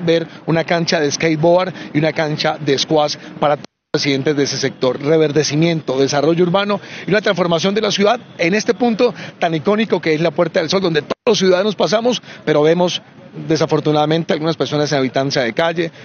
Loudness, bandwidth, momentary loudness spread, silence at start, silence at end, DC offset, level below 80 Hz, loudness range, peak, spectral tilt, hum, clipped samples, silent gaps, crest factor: -16 LUFS; 7 kHz; 5 LU; 0 s; 0 s; under 0.1%; -58 dBFS; 1 LU; 0 dBFS; -5 dB/octave; none; under 0.1%; none; 16 dB